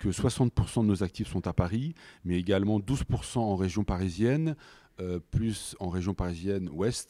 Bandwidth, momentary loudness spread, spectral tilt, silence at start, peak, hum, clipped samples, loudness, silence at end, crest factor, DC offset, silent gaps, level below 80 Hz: 14 kHz; 8 LU; -6.5 dB/octave; 0 s; -12 dBFS; none; under 0.1%; -30 LUFS; 0.05 s; 18 dB; under 0.1%; none; -44 dBFS